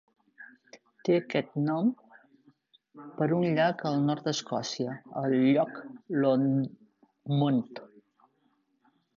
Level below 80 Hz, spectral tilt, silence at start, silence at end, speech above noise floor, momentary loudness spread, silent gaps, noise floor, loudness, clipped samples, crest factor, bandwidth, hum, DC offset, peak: -74 dBFS; -6.5 dB/octave; 0.4 s; 1.3 s; 44 dB; 19 LU; none; -72 dBFS; -28 LUFS; under 0.1%; 18 dB; 7.4 kHz; none; under 0.1%; -12 dBFS